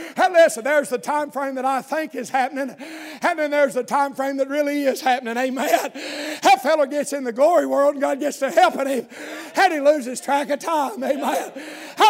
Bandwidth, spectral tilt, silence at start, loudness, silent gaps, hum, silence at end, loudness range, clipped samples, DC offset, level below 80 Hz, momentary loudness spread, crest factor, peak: 16 kHz; -2.5 dB/octave; 0 s; -20 LUFS; none; none; 0 s; 3 LU; under 0.1%; under 0.1%; -82 dBFS; 11 LU; 18 dB; -2 dBFS